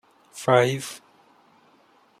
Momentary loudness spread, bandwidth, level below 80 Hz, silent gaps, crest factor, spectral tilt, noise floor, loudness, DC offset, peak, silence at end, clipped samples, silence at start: 24 LU; 15 kHz; -70 dBFS; none; 22 dB; -5 dB/octave; -59 dBFS; -22 LUFS; under 0.1%; -4 dBFS; 1.25 s; under 0.1%; 0.35 s